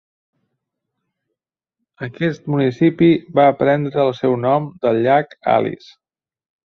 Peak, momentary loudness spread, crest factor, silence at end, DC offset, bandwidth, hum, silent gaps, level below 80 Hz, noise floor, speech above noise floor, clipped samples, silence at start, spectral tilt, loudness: -2 dBFS; 9 LU; 16 dB; 0.9 s; under 0.1%; 6.4 kHz; none; none; -60 dBFS; -81 dBFS; 64 dB; under 0.1%; 2 s; -8.5 dB/octave; -17 LUFS